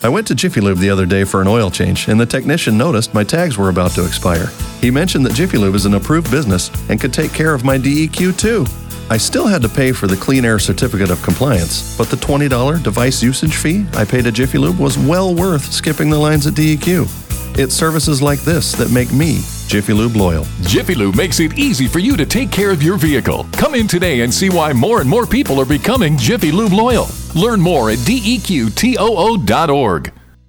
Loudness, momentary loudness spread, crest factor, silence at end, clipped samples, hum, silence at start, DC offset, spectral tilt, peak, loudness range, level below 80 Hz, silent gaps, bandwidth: -14 LUFS; 4 LU; 12 dB; 0.4 s; under 0.1%; none; 0 s; under 0.1%; -5 dB/octave; -2 dBFS; 1 LU; -28 dBFS; none; over 20 kHz